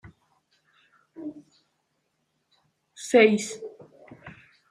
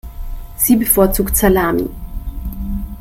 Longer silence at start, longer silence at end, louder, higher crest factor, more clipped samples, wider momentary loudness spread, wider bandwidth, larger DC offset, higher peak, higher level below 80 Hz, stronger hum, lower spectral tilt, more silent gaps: first, 1.2 s vs 0.05 s; first, 0.4 s vs 0 s; second, -21 LUFS vs -15 LUFS; first, 24 dB vs 16 dB; neither; first, 28 LU vs 19 LU; second, 14 kHz vs 17 kHz; neither; second, -6 dBFS vs 0 dBFS; second, -72 dBFS vs -26 dBFS; neither; about the same, -4 dB/octave vs -5 dB/octave; neither